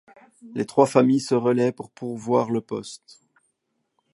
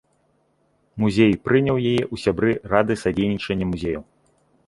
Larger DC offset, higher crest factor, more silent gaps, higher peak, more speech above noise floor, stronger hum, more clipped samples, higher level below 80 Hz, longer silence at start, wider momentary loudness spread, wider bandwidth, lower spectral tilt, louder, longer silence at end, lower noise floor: neither; about the same, 22 dB vs 20 dB; neither; about the same, -2 dBFS vs -2 dBFS; first, 53 dB vs 44 dB; neither; neither; second, -70 dBFS vs -46 dBFS; second, 0.45 s vs 0.95 s; first, 17 LU vs 9 LU; about the same, 11.5 kHz vs 11.5 kHz; about the same, -6.5 dB/octave vs -7 dB/octave; about the same, -22 LUFS vs -21 LUFS; first, 1.15 s vs 0.65 s; first, -75 dBFS vs -65 dBFS